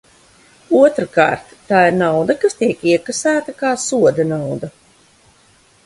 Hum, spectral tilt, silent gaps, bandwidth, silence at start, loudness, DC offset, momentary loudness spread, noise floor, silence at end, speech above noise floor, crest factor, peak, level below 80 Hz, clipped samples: none; -5 dB/octave; none; 11.5 kHz; 0.7 s; -16 LUFS; under 0.1%; 9 LU; -52 dBFS; 1.15 s; 37 dB; 16 dB; 0 dBFS; -56 dBFS; under 0.1%